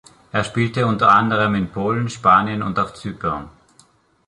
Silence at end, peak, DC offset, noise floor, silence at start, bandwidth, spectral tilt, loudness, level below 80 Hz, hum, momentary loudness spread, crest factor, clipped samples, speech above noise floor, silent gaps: 0.8 s; -2 dBFS; under 0.1%; -55 dBFS; 0.35 s; 11.5 kHz; -6.5 dB/octave; -18 LUFS; -48 dBFS; none; 12 LU; 18 dB; under 0.1%; 37 dB; none